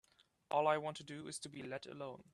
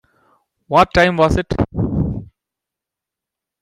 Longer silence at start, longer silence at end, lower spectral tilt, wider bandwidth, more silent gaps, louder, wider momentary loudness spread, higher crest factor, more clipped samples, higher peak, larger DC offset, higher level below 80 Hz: second, 0.5 s vs 0.7 s; second, 0.1 s vs 1.35 s; second, -4 dB/octave vs -6.5 dB/octave; about the same, 12.5 kHz vs 13.5 kHz; neither; second, -41 LUFS vs -16 LUFS; first, 14 LU vs 9 LU; about the same, 20 dB vs 18 dB; neither; second, -20 dBFS vs 0 dBFS; neither; second, -82 dBFS vs -34 dBFS